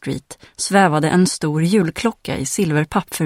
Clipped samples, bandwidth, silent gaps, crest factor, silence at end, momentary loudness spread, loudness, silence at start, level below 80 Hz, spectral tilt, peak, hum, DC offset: under 0.1%; 16.5 kHz; none; 18 dB; 0 s; 11 LU; -18 LUFS; 0.05 s; -48 dBFS; -5 dB/octave; 0 dBFS; none; under 0.1%